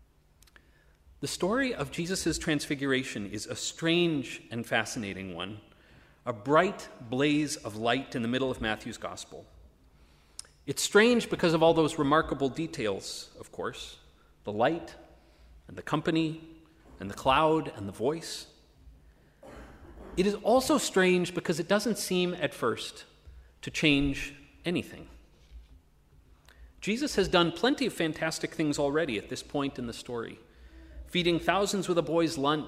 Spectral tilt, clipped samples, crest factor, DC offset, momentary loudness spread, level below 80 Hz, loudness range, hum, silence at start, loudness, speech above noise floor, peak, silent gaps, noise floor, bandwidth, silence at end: -4.5 dB/octave; under 0.1%; 22 dB; under 0.1%; 18 LU; -54 dBFS; 7 LU; none; 1.2 s; -29 LUFS; 33 dB; -8 dBFS; none; -62 dBFS; 16 kHz; 0 s